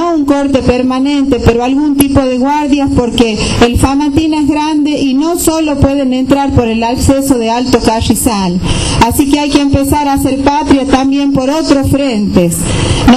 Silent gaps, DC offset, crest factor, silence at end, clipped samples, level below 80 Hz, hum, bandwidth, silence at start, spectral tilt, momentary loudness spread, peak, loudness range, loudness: none; under 0.1%; 10 dB; 0 s; 0.6%; -24 dBFS; none; 14.5 kHz; 0 s; -5 dB/octave; 2 LU; 0 dBFS; 1 LU; -10 LUFS